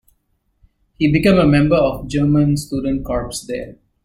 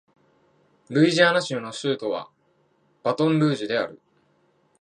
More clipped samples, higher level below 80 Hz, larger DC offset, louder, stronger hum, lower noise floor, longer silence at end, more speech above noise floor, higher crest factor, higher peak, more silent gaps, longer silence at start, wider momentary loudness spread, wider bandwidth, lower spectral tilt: neither; first, -36 dBFS vs -74 dBFS; neither; first, -17 LUFS vs -23 LUFS; neither; about the same, -65 dBFS vs -65 dBFS; second, 0.35 s vs 0.85 s; first, 49 dB vs 43 dB; second, 14 dB vs 22 dB; about the same, -2 dBFS vs -4 dBFS; neither; about the same, 1 s vs 0.9 s; about the same, 13 LU vs 12 LU; first, 15.5 kHz vs 10 kHz; first, -7 dB/octave vs -5.5 dB/octave